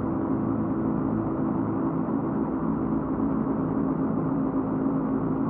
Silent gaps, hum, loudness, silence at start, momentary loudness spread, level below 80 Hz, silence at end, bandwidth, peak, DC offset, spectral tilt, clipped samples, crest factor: none; none; -27 LUFS; 0 s; 1 LU; -46 dBFS; 0 s; 2.9 kHz; -14 dBFS; under 0.1%; -11.5 dB/octave; under 0.1%; 12 dB